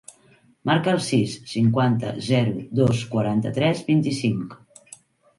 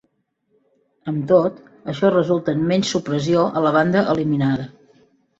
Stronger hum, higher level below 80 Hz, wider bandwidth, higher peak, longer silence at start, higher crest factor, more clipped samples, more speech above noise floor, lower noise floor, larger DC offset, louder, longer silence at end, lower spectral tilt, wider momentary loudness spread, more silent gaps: neither; about the same, -56 dBFS vs -58 dBFS; first, 11.5 kHz vs 8 kHz; second, -6 dBFS vs -2 dBFS; second, 0.65 s vs 1.05 s; about the same, 16 dB vs 18 dB; neither; second, 35 dB vs 50 dB; second, -57 dBFS vs -68 dBFS; neither; second, -22 LUFS vs -19 LUFS; about the same, 0.8 s vs 0.75 s; about the same, -6.5 dB/octave vs -6.5 dB/octave; second, 5 LU vs 11 LU; neither